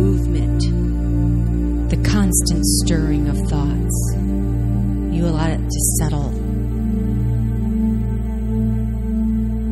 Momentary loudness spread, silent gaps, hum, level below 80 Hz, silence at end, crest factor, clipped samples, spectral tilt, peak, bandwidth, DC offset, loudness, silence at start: 5 LU; none; none; -22 dBFS; 0 s; 14 dB; under 0.1%; -5.5 dB/octave; -4 dBFS; 14.5 kHz; under 0.1%; -19 LUFS; 0 s